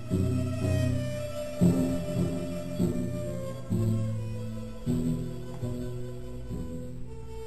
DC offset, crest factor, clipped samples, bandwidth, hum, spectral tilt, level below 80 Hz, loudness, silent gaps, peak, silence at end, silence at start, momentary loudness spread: 0.9%; 18 dB; under 0.1%; 13.5 kHz; none; -7.5 dB/octave; -44 dBFS; -31 LUFS; none; -12 dBFS; 0 s; 0 s; 12 LU